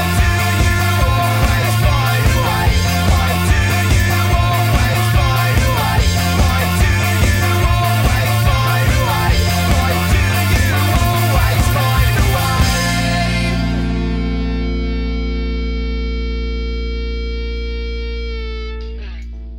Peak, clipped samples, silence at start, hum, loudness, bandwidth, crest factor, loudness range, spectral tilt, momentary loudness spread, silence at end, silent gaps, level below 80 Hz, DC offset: -2 dBFS; under 0.1%; 0 s; none; -15 LUFS; 16.5 kHz; 12 dB; 8 LU; -5 dB/octave; 9 LU; 0 s; none; -20 dBFS; 0.2%